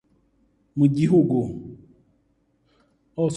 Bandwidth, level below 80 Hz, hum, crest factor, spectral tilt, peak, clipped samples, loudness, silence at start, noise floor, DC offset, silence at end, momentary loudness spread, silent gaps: 11 kHz; -58 dBFS; none; 18 dB; -8.5 dB/octave; -6 dBFS; under 0.1%; -21 LUFS; 0.75 s; -66 dBFS; under 0.1%; 0 s; 20 LU; none